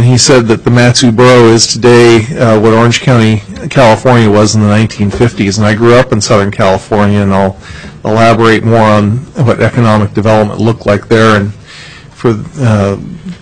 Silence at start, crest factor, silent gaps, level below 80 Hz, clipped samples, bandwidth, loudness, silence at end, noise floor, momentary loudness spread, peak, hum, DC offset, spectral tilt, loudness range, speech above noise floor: 0 s; 8 dB; none; -34 dBFS; 1%; 11 kHz; -7 LUFS; 0.05 s; -30 dBFS; 9 LU; 0 dBFS; none; 2%; -5.5 dB/octave; 4 LU; 23 dB